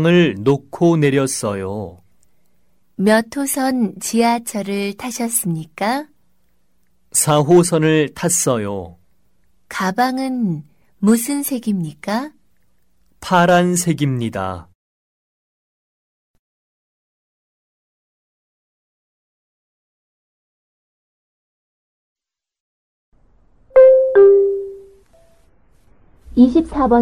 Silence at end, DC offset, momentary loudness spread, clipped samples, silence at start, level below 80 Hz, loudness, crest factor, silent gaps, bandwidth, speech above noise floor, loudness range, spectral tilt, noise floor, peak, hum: 0 s; 0.2%; 15 LU; under 0.1%; 0 s; -48 dBFS; -16 LUFS; 18 dB; 14.75-22.16 s, 22.60-23.12 s; 16 kHz; 49 dB; 6 LU; -5 dB/octave; -66 dBFS; 0 dBFS; none